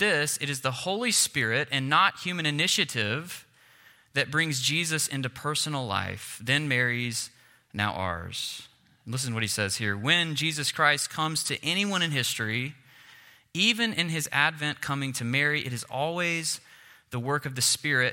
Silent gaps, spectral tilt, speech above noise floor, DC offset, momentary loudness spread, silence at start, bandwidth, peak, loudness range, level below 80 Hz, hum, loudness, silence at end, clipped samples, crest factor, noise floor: none; -2.5 dB/octave; 30 dB; under 0.1%; 10 LU; 0 s; 16.5 kHz; -6 dBFS; 4 LU; -68 dBFS; none; -26 LUFS; 0 s; under 0.1%; 22 dB; -57 dBFS